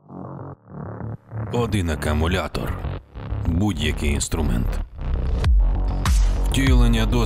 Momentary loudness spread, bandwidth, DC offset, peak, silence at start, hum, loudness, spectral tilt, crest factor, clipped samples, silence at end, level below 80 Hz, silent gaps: 15 LU; 15 kHz; under 0.1%; -4 dBFS; 0.1 s; none; -23 LUFS; -5.5 dB/octave; 16 dB; under 0.1%; 0 s; -24 dBFS; none